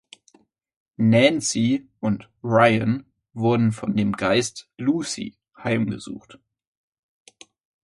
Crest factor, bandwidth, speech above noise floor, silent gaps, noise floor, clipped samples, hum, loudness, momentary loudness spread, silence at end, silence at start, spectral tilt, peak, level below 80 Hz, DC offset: 20 dB; 11.5 kHz; 38 dB; none; -60 dBFS; under 0.1%; none; -22 LUFS; 15 LU; 1.65 s; 1 s; -5.5 dB/octave; -2 dBFS; -58 dBFS; under 0.1%